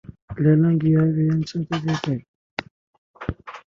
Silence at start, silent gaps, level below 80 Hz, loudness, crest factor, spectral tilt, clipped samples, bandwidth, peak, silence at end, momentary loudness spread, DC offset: 0.1 s; 0.22-0.28 s, 2.28-2.57 s, 2.71-3.14 s; -46 dBFS; -21 LUFS; 16 dB; -8 dB/octave; under 0.1%; 7.2 kHz; -6 dBFS; 0.2 s; 16 LU; under 0.1%